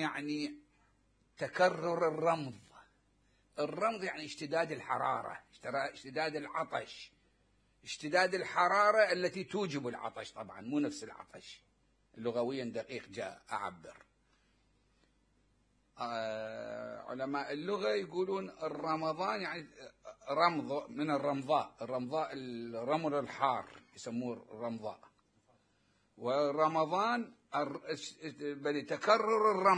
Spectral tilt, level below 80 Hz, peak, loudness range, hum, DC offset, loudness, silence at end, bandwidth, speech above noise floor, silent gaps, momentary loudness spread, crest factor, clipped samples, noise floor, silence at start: -5 dB/octave; -76 dBFS; -14 dBFS; 9 LU; none; under 0.1%; -35 LUFS; 0 s; 10.5 kHz; 38 dB; none; 16 LU; 24 dB; under 0.1%; -74 dBFS; 0 s